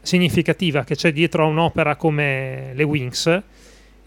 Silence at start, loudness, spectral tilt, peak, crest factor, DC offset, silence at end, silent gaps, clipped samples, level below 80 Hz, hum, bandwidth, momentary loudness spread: 0.05 s; -19 LUFS; -5.5 dB/octave; -4 dBFS; 16 dB; under 0.1%; 0.65 s; none; under 0.1%; -48 dBFS; none; 16.5 kHz; 5 LU